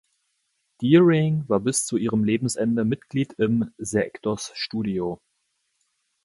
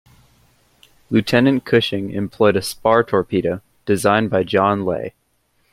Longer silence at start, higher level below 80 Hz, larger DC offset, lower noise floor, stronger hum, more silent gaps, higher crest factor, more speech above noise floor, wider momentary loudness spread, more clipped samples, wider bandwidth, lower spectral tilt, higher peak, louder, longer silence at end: second, 0.8 s vs 1.1 s; about the same, -58 dBFS vs -54 dBFS; neither; first, -74 dBFS vs -64 dBFS; neither; neither; about the same, 18 dB vs 18 dB; first, 51 dB vs 46 dB; about the same, 11 LU vs 9 LU; neither; second, 11.5 kHz vs 16 kHz; about the same, -5.5 dB/octave vs -5.5 dB/octave; second, -6 dBFS vs -2 dBFS; second, -23 LUFS vs -18 LUFS; first, 1.1 s vs 0.65 s